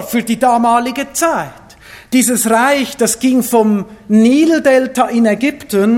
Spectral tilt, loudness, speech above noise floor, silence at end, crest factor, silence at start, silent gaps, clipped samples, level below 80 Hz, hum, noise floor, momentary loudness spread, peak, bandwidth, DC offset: -4 dB/octave; -13 LUFS; 26 dB; 0 s; 12 dB; 0 s; none; under 0.1%; -50 dBFS; none; -38 dBFS; 6 LU; 0 dBFS; 17 kHz; under 0.1%